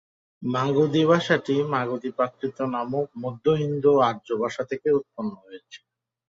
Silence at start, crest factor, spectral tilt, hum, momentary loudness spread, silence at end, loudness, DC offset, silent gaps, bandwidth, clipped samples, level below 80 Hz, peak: 0.4 s; 20 dB; -7 dB/octave; none; 14 LU; 0.5 s; -24 LUFS; under 0.1%; none; 7.6 kHz; under 0.1%; -64 dBFS; -6 dBFS